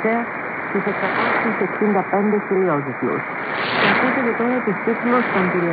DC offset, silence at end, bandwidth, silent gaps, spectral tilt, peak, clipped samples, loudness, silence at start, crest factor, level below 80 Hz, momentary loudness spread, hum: under 0.1%; 0 s; 5 kHz; none; -11 dB/octave; -4 dBFS; under 0.1%; -19 LUFS; 0 s; 16 dB; -62 dBFS; 6 LU; none